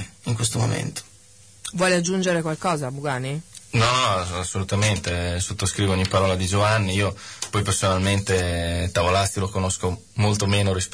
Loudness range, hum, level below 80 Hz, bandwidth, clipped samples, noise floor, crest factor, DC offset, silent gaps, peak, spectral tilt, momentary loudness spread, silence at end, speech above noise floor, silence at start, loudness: 2 LU; none; -44 dBFS; 11 kHz; under 0.1%; -50 dBFS; 14 dB; 0.1%; none; -8 dBFS; -4.5 dB/octave; 8 LU; 0 s; 28 dB; 0 s; -22 LUFS